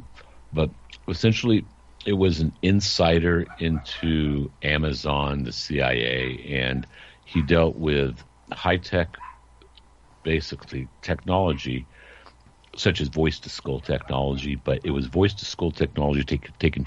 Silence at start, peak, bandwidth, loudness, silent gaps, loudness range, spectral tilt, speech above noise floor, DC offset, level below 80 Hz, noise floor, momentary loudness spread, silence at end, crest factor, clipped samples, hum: 0 s; -6 dBFS; 8 kHz; -24 LUFS; none; 5 LU; -6 dB/octave; 29 dB; under 0.1%; -38 dBFS; -53 dBFS; 12 LU; 0 s; 20 dB; under 0.1%; none